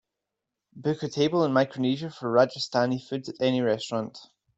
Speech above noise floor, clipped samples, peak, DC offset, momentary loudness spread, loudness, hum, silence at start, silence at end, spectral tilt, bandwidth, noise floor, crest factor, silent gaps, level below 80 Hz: 60 dB; under 0.1%; -8 dBFS; under 0.1%; 9 LU; -26 LUFS; none; 0.75 s; 0.35 s; -6 dB/octave; 8.2 kHz; -86 dBFS; 20 dB; none; -70 dBFS